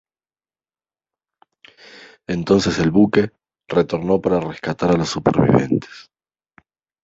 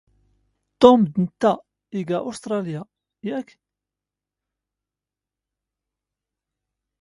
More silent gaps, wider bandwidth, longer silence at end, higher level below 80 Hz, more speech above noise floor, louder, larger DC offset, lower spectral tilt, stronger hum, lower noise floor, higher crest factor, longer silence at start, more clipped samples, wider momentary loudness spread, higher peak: neither; second, 8 kHz vs 11.5 kHz; second, 1 s vs 3.6 s; first, -46 dBFS vs -62 dBFS; first, over 73 dB vs 69 dB; first, -18 LUFS vs -21 LUFS; neither; about the same, -6.5 dB/octave vs -7 dB/octave; neither; about the same, under -90 dBFS vs -88 dBFS; second, 18 dB vs 24 dB; first, 2 s vs 0.8 s; neither; second, 11 LU vs 18 LU; about the same, -2 dBFS vs 0 dBFS